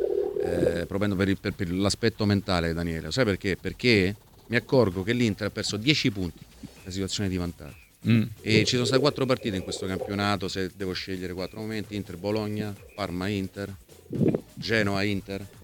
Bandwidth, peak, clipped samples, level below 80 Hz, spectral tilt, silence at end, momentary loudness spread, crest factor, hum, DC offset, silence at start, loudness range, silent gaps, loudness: 18.5 kHz; -2 dBFS; under 0.1%; -50 dBFS; -5.5 dB/octave; 0 s; 12 LU; 24 dB; none; under 0.1%; 0 s; 6 LU; none; -27 LUFS